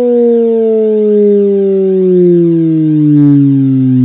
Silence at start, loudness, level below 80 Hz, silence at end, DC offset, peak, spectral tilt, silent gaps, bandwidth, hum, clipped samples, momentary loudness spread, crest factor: 0 s; -8 LUFS; -60 dBFS; 0 s; under 0.1%; 0 dBFS; -14 dB/octave; none; 3.8 kHz; none; 0.2%; 3 LU; 8 dB